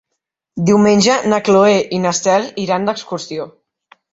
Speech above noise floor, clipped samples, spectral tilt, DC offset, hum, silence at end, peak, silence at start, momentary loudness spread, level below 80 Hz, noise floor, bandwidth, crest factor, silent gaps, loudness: 62 dB; under 0.1%; -4.5 dB/octave; under 0.1%; none; 0.65 s; 0 dBFS; 0.55 s; 15 LU; -54 dBFS; -76 dBFS; 8 kHz; 14 dB; none; -14 LUFS